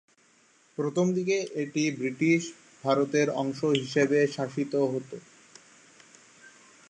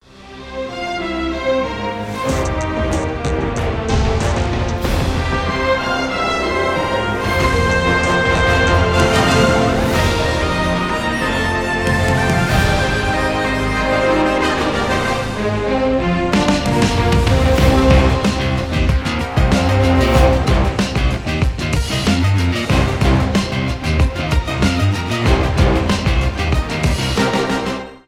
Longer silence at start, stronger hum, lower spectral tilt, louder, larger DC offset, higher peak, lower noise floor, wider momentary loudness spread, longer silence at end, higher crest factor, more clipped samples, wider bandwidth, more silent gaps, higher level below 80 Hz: first, 0.8 s vs 0.15 s; neither; about the same, -5.5 dB/octave vs -5.5 dB/octave; second, -27 LUFS vs -16 LUFS; neither; second, -8 dBFS vs 0 dBFS; first, -63 dBFS vs -36 dBFS; first, 10 LU vs 6 LU; first, 0.4 s vs 0.1 s; first, 20 dB vs 14 dB; neither; second, 9.6 kHz vs 16.5 kHz; neither; second, -76 dBFS vs -22 dBFS